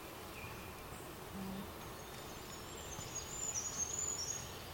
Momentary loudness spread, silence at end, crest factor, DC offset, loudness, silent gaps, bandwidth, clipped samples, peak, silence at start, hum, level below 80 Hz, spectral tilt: 11 LU; 0 s; 18 dB; under 0.1%; -43 LUFS; none; 17 kHz; under 0.1%; -28 dBFS; 0 s; none; -60 dBFS; -2 dB/octave